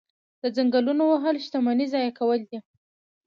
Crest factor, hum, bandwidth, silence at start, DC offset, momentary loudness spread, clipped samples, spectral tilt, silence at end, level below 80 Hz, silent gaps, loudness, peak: 14 dB; none; 6.8 kHz; 0.45 s; under 0.1%; 9 LU; under 0.1%; -6 dB/octave; 0.65 s; -80 dBFS; none; -24 LUFS; -10 dBFS